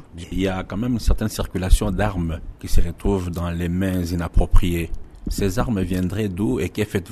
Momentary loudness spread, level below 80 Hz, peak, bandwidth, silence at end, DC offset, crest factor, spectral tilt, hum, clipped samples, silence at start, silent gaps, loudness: 6 LU; -24 dBFS; -2 dBFS; 13.5 kHz; 0 s; under 0.1%; 18 dB; -6.5 dB/octave; none; under 0.1%; 0.15 s; none; -24 LUFS